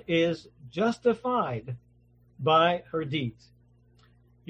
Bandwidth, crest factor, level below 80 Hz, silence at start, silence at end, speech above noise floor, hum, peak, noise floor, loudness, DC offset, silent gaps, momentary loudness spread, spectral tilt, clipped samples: 9 kHz; 20 dB; -62 dBFS; 0.1 s; 1.2 s; 34 dB; 60 Hz at -50 dBFS; -10 dBFS; -61 dBFS; -27 LUFS; under 0.1%; none; 16 LU; -6.5 dB/octave; under 0.1%